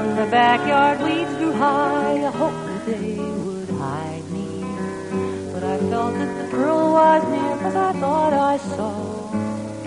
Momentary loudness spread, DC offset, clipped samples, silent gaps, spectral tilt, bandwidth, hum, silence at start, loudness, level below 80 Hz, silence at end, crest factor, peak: 12 LU; under 0.1%; under 0.1%; none; -6 dB/octave; 10.5 kHz; none; 0 s; -21 LUFS; -56 dBFS; 0 s; 16 dB; -4 dBFS